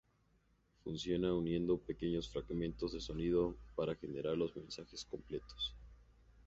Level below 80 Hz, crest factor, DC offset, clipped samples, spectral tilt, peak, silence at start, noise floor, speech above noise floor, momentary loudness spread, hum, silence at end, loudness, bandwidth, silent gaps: -56 dBFS; 18 dB; under 0.1%; under 0.1%; -6 dB/octave; -24 dBFS; 0.85 s; -74 dBFS; 35 dB; 11 LU; none; 0.05 s; -40 LUFS; 8 kHz; none